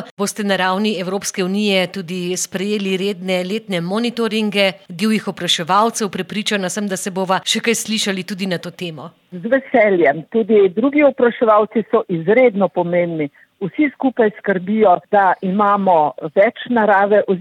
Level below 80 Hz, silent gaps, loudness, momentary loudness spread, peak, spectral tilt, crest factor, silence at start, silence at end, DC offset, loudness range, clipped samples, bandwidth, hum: -66 dBFS; 0.11-0.17 s; -17 LUFS; 9 LU; -2 dBFS; -4.5 dB/octave; 14 dB; 0 s; 0 s; under 0.1%; 5 LU; under 0.1%; 16 kHz; none